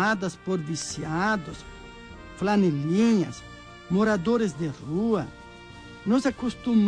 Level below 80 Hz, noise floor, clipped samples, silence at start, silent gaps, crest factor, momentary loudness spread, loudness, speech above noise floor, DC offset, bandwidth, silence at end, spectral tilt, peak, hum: -52 dBFS; -45 dBFS; under 0.1%; 0 s; none; 14 dB; 21 LU; -26 LUFS; 20 dB; under 0.1%; 10.5 kHz; 0 s; -6 dB/octave; -12 dBFS; 60 Hz at -45 dBFS